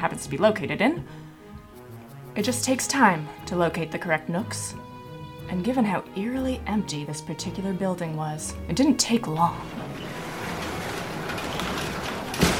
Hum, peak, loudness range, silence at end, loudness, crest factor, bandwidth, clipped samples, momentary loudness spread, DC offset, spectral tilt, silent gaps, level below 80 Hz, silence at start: none; -6 dBFS; 3 LU; 0 s; -26 LUFS; 22 dB; 18 kHz; under 0.1%; 18 LU; under 0.1%; -4.5 dB/octave; none; -48 dBFS; 0 s